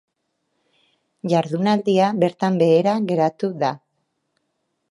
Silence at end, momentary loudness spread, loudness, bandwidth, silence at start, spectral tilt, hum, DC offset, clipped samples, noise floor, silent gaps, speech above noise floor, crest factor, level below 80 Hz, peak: 1.15 s; 8 LU; -19 LUFS; 11.5 kHz; 1.25 s; -7 dB/octave; none; under 0.1%; under 0.1%; -73 dBFS; none; 55 dB; 18 dB; -70 dBFS; -4 dBFS